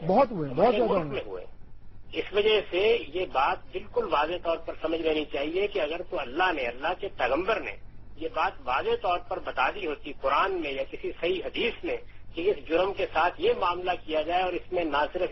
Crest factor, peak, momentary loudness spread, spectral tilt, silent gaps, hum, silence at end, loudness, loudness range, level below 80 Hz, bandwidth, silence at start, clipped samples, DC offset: 18 dB; -10 dBFS; 10 LU; -6.5 dB/octave; none; none; 0 s; -28 LUFS; 2 LU; -48 dBFS; 6 kHz; 0 s; under 0.1%; under 0.1%